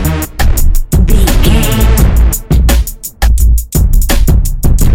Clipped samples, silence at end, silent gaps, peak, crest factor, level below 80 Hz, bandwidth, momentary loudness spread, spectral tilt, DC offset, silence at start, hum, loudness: 0.4%; 0 s; none; 0 dBFS; 8 dB; -8 dBFS; 17 kHz; 5 LU; -5 dB/octave; under 0.1%; 0 s; none; -11 LUFS